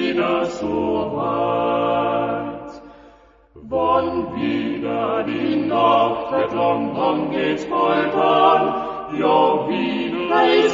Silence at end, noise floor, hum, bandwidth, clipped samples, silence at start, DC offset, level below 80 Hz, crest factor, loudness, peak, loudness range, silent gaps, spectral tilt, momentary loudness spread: 0 s; -49 dBFS; none; 7.6 kHz; under 0.1%; 0 s; under 0.1%; -52 dBFS; 18 dB; -19 LUFS; -2 dBFS; 5 LU; none; -6 dB/octave; 8 LU